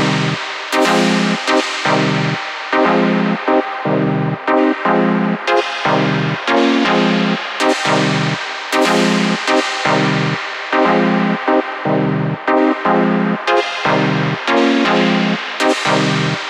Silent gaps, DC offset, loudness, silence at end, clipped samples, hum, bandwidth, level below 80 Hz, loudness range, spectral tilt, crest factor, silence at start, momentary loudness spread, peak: none; under 0.1%; -15 LUFS; 0 s; under 0.1%; none; 15.5 kHz; -60 dBFS; 1 LU; -5 dB/octave; 14 dB; 0 s; 5 LU; -2 dBFS